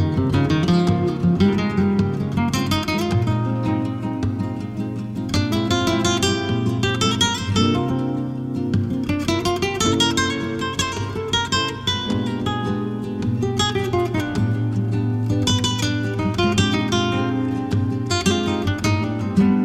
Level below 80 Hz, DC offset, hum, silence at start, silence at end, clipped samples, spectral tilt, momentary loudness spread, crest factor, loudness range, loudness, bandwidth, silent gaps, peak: -42 dBFS; under 0.1%; none; 0 s; 0 s; under 0.1%; -5 dB/octave; 6 LU; 16 dB; 2 LU; -21 LUFS; 15.5 kHz; none; -4 dBFS